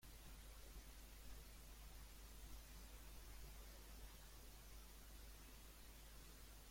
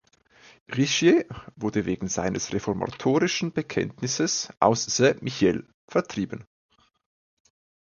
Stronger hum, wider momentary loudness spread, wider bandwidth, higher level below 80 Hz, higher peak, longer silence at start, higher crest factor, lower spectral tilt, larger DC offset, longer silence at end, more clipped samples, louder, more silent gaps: neither; second, 2 LU vs 11 LU; first, 16.5 kHz vs 7.4 kHz; about the same, -60 dBFS vs -56 dBFS; second, -46 dBFS vs -4 dBFS; second, 0 s vs 0.7 s; second, 14 dB vs 22 dB; about the same, -3 dB/octave vs -4 dB/octave; neither; second, 0 s vs 1.45 s; neither; second, -61 LUFS vs -25 LUFS; second, none vs 5.74-5.88 s